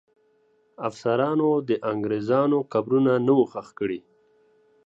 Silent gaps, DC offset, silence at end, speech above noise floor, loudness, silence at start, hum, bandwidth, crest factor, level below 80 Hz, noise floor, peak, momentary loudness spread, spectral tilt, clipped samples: none; under 0.1%; 0.85 s; 41 dB; -24 LUFS; 0.8 s; none; 7.8 kHz; 16 dB; -70 dBFS; -64 dBFS; -8 dBFS; 10 LU; -8 dB/octave; under 0.1%